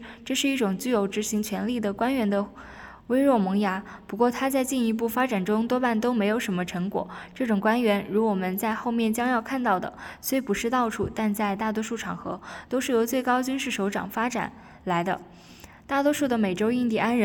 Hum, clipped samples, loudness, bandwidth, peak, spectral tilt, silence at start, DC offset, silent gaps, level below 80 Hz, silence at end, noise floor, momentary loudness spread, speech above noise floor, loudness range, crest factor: none; under 0.1%; -26 LUFS; 19 kHz; -10 dBFS; -5 dB/octave; 0 s; under 0.1%; none; -58 dBFS; 0 s; -48 dBFS; 9 LU; 23 dB; 2 LU; 16 dB